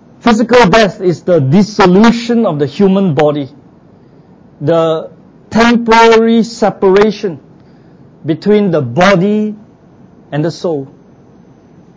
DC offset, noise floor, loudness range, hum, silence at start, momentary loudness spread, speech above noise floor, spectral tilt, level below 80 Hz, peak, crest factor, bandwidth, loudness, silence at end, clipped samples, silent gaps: under 0.1%; -41 dBFS; 5 LU; none; 0.25 s; 14 LU; 32 dB; -6.5 dB/octave; -42 dBFS; 0 dBFS; 12 dB; 8 kHz; -10 LUFS; 1.1 s; 0.5%; none